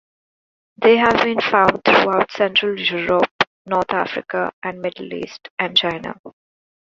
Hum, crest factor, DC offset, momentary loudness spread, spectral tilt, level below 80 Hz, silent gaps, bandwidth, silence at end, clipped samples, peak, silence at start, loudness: none; 18 dB; under 0.1%; 14 LU; -5 dB/octave; -56 dBFS; 3.31-3.39 s, 3.47-3.65 s, 4.53-4.62 s, 5.50-5.57 s, 6.19-6.24 s; 7.4 kHz; 0.55 s; under 0.1%; 0 dBFS; 0.8 s; -17 LUFS